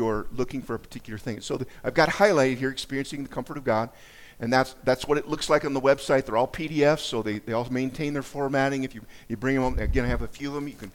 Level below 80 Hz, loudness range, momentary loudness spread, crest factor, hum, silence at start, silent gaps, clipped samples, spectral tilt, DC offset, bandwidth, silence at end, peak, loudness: -40 dBFS; 3 LU; 12 LU; 20 dB; none; 0 s; none; under 0.1%; -5.5 dB/octave; under 0.1%; 17.5 kHz; 0.05 s; -6 dBFS; -26 LUFS